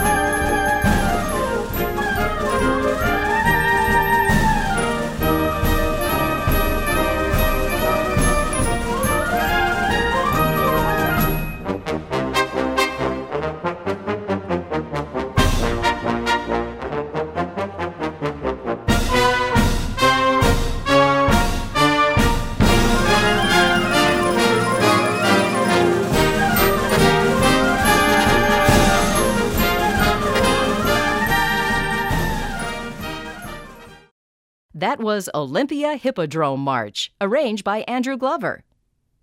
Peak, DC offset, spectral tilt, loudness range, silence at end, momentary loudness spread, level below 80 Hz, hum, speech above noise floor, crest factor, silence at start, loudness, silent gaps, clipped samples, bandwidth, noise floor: -2 dBFS; under 0.1%; -4.5 dB/octave; 7 LU; 0.65 s; 10 LU; -28 dBFS; none; 45 dB; 18 dB; 0 s; -19 LUFS; 34.11-34.69 s; under 0.1%; 16 kHz; -67 dBFS